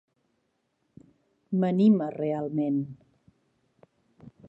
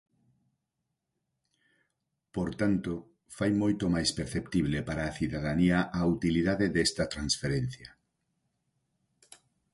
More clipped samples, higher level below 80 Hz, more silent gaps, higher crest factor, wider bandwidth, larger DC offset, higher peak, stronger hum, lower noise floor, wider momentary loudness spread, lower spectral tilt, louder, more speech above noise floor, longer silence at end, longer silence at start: neither; second, -74 dBFS vs -50 dBFS; neither; about the same, 18 dB vs 18 dB; second, 5.4 kHz vs 11.5 kHz; neither; about the same, -12 dBFS vs -14 dBFS; neither; second, -75 dBFS vs -84 dBFS; about the same, 10 LU vs 9 LU; first, -10.5 dB/octave vs -5 dB/octave; first, -26 LUFS vs -30 LUFS; second, 50 dB vs 55 dB; second, 0.2 s vs 1.85 s; second, 1.5 s vs 2.35 s